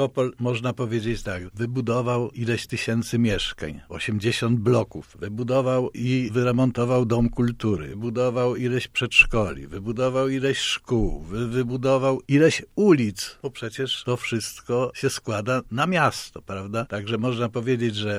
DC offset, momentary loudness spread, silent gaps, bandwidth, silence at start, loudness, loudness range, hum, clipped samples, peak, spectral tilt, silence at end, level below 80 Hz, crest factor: under 0.1%; 11 LU; none; 15 kHz; 0 s; -24 LUFS; 4 LU; none; under 0.1%; -2 dBFS; -5.5 dB/octave; 0 s; -42 dBFS; 22 dB